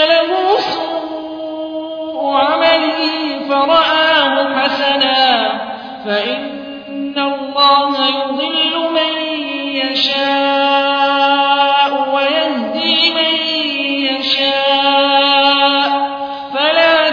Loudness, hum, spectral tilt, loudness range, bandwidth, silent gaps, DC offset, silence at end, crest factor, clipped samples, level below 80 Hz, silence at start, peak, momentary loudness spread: -13 LUFS; none; -3.5 dB/octave; 3 LU; 5.4 kHz; none; under 0.1%; 0 s; 14 dB; under 0.1%; -58 dBFS; 0 s; 0 dBFS; 12 LU